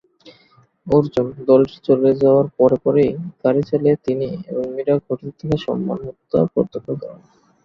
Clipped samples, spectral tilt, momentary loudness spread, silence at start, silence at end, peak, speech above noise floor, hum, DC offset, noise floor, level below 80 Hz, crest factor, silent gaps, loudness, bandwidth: under 0.1%; -9.5 dB/octave; 11 LU; 0.25 s; 0.5 s; -2 dBFS; 37 dB; none; under 0.1%; -55 dBFS; -52 dBFS; 16 dB; none; -18 LUFS; 6.6 kHz